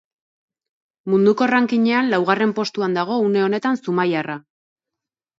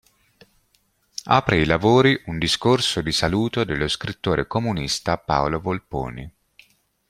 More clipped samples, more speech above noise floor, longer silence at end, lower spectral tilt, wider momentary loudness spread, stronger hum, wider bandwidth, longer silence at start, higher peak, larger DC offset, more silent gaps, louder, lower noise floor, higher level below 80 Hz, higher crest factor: neither; first, 67 dB vs 44 dB; first, 1 s vs 0.8 s; first, -6.5 dB/octave vs -5 dB/octave; second, 7 LU vs 13 LU; neither; second, 7.8 kHz vs 15 kHz; second, 1.05 s vs 1.25 s; about the same, -2 dBFS vs -2 dBFS; neither; neither; about the same, -19 LUFS vs -21 LUFS; first, -86 dBFS vs -65 dBFS; second, -70 dBFS vs -42 dBFS; about the same, 18 dB vs 20 dB